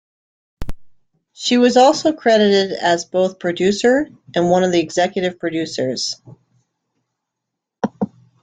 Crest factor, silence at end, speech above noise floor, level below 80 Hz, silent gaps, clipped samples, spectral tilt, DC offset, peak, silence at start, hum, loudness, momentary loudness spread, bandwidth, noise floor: 16 dB; 0.35 s; 64 dB; -46 dBFS; none; under 0.1%; -4.5 dB/octave; under 0.1%; -2 dBFS; 0.6 s; none; -17 LUFS; 14 LU; 9.4 kHz; -80 dBFS